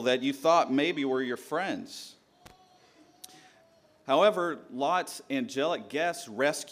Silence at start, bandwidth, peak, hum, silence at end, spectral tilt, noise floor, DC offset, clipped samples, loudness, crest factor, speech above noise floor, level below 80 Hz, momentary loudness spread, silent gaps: 0 s; 15.5 kHz; -10 dBFS; none; 0 s; -4 dB/octave; -62 dBFS; under 0.1%; under 0.1%; -29 LUFS; 20 dB; 33 dB; -78 dBFS; 19 LU; none